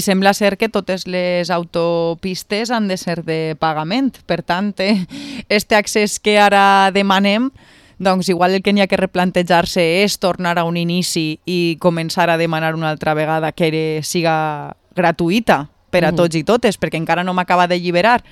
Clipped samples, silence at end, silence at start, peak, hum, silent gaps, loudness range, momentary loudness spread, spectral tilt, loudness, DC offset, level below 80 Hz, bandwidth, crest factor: under 0.1%; 0.1 s; 0 s; 0 dBFS; none; none; 5 LU; 7 LU; -5 dB/octave; -16 LUFS; under 0.1%; -50 dBFS; 16 kHz; 16 dB